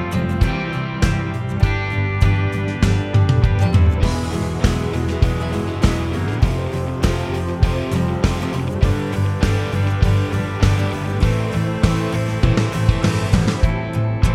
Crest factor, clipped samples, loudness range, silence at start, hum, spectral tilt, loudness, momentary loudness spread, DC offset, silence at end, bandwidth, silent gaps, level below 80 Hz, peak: 18 dB; under 0.1%; 2 LU; 0 s; none; -6.5 dB/octave; -19 LUFS; 5 LU; under 0.1%; 0 s; 13.5 kHz; none; -24 dBFS; 0 dBFS